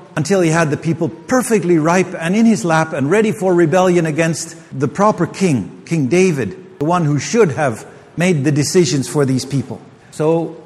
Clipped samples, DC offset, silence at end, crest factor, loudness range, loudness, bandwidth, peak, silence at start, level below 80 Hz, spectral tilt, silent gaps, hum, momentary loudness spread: under 0.1%; under 0.1%; 0.05 s; 16 dB; 3 LU; -15 LUFS; 13.5 kHz; 0 dBFS; 0 s; -54 dBFS; -6 dB/octave; none; none; 9 LU